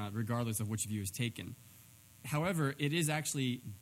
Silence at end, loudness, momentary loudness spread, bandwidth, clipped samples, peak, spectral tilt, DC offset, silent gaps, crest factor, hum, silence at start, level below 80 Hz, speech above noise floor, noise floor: 0 s; -36 LUFS; 13 LU; 17 kHz; under 0.1%; -18 dBFS; -4.5 dB/octave; under 0.1%; none; 18 dB; none; 0 s; -72 dBFS; 23 dB; -59 dBFS